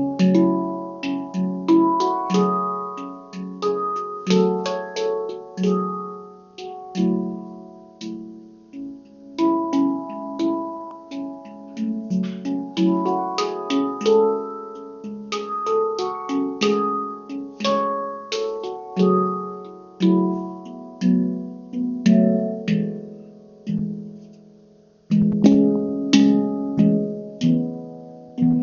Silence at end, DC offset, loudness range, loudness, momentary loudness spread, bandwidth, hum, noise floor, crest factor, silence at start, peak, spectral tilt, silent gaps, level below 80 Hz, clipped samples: 0 s; under 0.1%; 7 LU; -22 LUFS; 18 LU; 7.2 kHz; none; -52 dBFS; 20 dB; 0 s; -2 dBFS; -6.5 dB/octave; none; -60 dBFS; under 0.1%